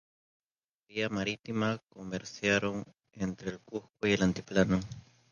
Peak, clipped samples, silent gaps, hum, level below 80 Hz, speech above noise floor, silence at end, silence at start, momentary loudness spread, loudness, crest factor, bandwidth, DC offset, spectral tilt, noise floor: -12 dBFS; under 0.1%; none; none; -58 dBFS; 50 dB; 0.3 s; 0.9 s; 14 LU; -32 LUFS; 22 dB; 7.2 kHz; under 0.1%; -5.5 dB/octave; -82 dBFS